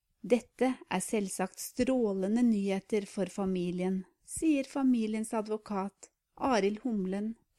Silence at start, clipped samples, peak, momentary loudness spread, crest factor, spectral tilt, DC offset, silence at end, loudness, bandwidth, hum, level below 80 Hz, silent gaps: 0.25 s; under 0.1%; -14 dBFS; 7 LU; 18 dB; -5.5 dB/octave; under 0.1%; 0.25 s; -32 LUFS; 14.5 kHz; none; -62 dBFS; none